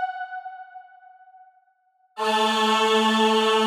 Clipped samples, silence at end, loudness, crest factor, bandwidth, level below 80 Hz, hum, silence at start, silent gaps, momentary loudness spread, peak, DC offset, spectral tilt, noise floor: under 0.1%; 0 s; -21 LUFS; 14 dB; 18 kHz; under -90 dBFS; none; 0 s; none; 21 LU; -8 dBFS; under 0.1%; -3 dB/octave; -65 dBFS